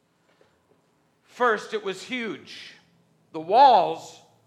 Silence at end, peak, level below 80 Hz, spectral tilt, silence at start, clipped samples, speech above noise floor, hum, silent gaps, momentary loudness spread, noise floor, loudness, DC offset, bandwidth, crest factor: 0.35 s; -6 dBFS; -84 dBFS; -4 dB/octave; 1.4 s; under 0.1%; 44 dB; none; none; 24 LU; -66 dBFS; -22 LUFS; under 0.1%; 11 kHz; 20 dB